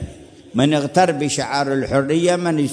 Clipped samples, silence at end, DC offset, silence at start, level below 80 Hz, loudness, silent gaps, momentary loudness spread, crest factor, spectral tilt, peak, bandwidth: under 0.1%; 0 s; under 0.1%; 0 s; -46 dBFS; -18 LUFS; none; 4 LU; 16 dB; -5 dB/octave; -2 dBFS; 11 kHz